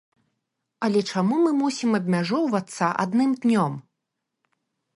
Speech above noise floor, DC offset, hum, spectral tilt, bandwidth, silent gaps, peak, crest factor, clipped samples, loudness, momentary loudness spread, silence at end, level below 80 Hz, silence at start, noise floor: 59 dB; under 0.1%; none; -6 dB/octave; 11.5 kHz; none; -8 dBFS; 16 dB; under 0.1%; -23 LUFS; 5 LU; 1.15 s; -72 dBFS; 0.8 s; -82 dBFS